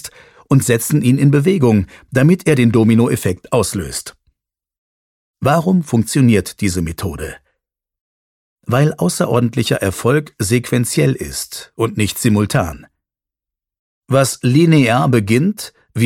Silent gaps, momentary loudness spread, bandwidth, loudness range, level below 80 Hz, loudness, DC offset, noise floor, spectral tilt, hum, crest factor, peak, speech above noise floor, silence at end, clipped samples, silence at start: 4.78-5.34 s, 8.01-8.56 s, 13.79-14.01 s; 12 LU; 17 kHz; 5 LU; -42 dBFS; -15 LUFS; under 0.1%; -86 dBFS; -6 dB/octave; none; 14 dB; 0 dBFS; 72 dB; 0 s; under 0.1%; 0.05 s